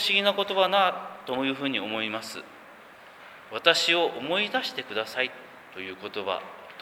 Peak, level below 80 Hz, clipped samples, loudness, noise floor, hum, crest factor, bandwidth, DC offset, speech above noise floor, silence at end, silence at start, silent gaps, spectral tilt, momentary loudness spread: -4 dBFS; -76 dBFS; under 0.1%; -26 LUFS; -49 dBFS; none; 24 dB; over 20 kHz; under 0.1%; 22 dB; 0 s; 0 s; none; -2.5 dB/octave; 19 LU